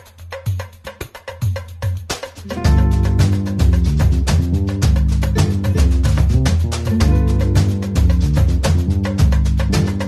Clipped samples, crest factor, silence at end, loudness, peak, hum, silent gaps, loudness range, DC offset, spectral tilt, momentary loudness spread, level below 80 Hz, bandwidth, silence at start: under 0.1%; 12 dB; 0 s; -17 LUFS; -4 dBFS; none; none; 3 LU; under 0.1%; -6.5 dB/octave; 11 LU; -18 dBFS; 13.5 kHz; 0.2 s